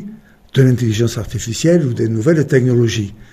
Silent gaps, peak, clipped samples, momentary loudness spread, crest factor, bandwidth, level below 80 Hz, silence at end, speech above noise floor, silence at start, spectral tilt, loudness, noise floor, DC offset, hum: none; 0 dBFS; under 0.1%; 9 LU; 14 dB; 14.5 kHz; -42 dBFS; 0.1 s; 21 dB; 0 s; -6.5 dB/octave; -15 LUFS; -36 dBFS; under 0.1%; none